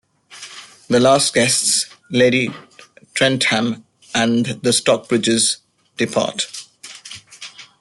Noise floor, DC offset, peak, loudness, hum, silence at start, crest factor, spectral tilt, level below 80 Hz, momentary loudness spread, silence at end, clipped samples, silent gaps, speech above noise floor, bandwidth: -46 dBFS; under 0.1%; -2 dBFS; -17 LUFS; none; 0.3 s; 18 dB; -3 dB/octave; -58 dBFS; 21 LU; 0.15 s; under 0.1%; none; 29 dB; 12.5 kHz